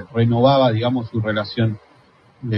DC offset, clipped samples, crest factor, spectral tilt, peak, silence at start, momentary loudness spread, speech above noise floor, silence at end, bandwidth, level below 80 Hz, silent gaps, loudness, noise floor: under 0.1%; under 0.1%; 16 dB; -9.5 dB/octave; -4 dBFS; 0 s; 11 LU; 35 dB; 0 s; 5.8 kHz; -52 dBFS; none; -18 LUFS; -52 dBFS